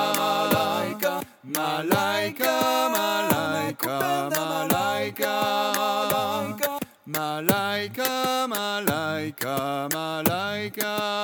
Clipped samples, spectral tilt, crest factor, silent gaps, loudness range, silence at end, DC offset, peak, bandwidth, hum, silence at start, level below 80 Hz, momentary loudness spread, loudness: under 0.1%; -3.5 dB/octave; 22 dB; none; 2 LU; 0 s; under 0.1%; -2 dBFS; over 20 kHz; none; 0 s; -64 dBFS; 5 LU; -25 LUFS